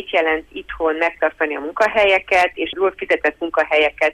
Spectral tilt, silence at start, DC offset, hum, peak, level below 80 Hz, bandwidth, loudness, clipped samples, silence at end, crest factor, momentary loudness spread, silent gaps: -3.5 dB/octave; 0 s; under 0.1%; none; -4 dBFS; -48 dBFS; 12.5 kHz; -18 LUFS; under 0.1%; 0 s; 14 dB; 8 LU; none